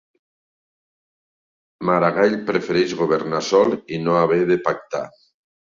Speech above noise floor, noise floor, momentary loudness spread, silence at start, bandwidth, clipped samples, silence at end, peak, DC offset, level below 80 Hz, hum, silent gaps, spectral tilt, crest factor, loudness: over 71 dB; under -90 dBFS; 9 LU; 1.8 s; 7.6 kHz; under 0.1%; 0.7 s; -2 dBFS; under 0.1%; -62 dBFS; none; none; -6 dB/octave; 18 dB; -20 LUFS